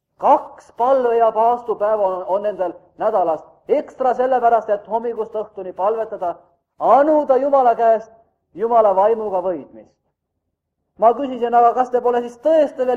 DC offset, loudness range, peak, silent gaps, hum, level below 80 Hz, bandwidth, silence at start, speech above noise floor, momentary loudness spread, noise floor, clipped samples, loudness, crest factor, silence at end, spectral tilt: under 0.1%; 3 LU; -2 dBFS; none; none; -64 dBFS; 7.6 kHz; 0.2 s; 58 dB; 11 LU; -76 dBFS; under 0.1%; -18 LUFS; 16 dB; 0 s; -6.5 dB/octave